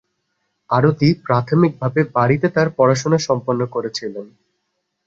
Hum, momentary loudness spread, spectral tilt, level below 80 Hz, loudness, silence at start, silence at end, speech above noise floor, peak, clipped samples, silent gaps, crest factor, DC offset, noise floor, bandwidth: none; 9 LU; -6.5 dB/octave; -54 dBFS; -17 LUFS; 0.7 s; 0.8 s; 56 dB; -2 dBFS; under 0.1%; none; 16 dB; under 0.1%; -73 dBFS; 7.8 kHz